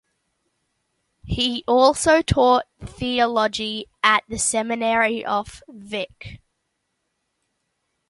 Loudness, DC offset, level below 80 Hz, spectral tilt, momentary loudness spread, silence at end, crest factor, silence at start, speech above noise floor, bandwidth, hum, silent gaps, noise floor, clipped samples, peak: -20 LUFS; under 0.1%; -44 dBFS; -3.5 dB/octave; 14 LU; 1.75 s; 22 dB; 1.25 s; 54 dB; 11.5 kHz; none; none; -75 dBFS; under 0.1%; 0 dBFS